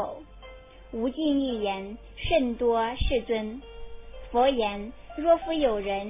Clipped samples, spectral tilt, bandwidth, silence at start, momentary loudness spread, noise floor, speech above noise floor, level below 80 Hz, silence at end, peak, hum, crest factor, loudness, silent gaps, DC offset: under 0.1%; -9.5 dB/octave; 3.9 kHz; 0 s; 22 LU; -47 dBFS; 21 dB; -42 dBFS; 0 s; -10 dBFS; none; 16 dB; -27 LUFS; none; under 0.1%